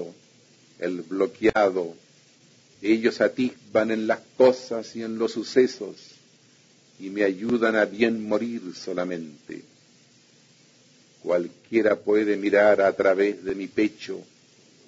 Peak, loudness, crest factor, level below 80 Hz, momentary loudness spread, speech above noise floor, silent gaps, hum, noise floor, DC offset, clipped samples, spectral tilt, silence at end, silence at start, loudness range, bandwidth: -6 dBFS; -24 LUFS; 20 dB; -64 dBFS; 17 LU; 34 dB; none; none; -57 dBFS; under 0.1%; under 0.1%; -5.5 dB/octave; 0.65 s; 0 s; 7 LU; 7.8 kHz